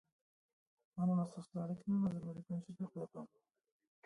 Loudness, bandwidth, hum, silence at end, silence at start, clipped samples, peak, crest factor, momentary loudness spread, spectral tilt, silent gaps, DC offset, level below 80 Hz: -41 LUFS; 11 kHz; none; 0.8 s; 0.95 s; under 0.1%; -28 dBFS; 14 dB; 15 LU; -10 dB/octave; none; under 0.1%; -78 dBFS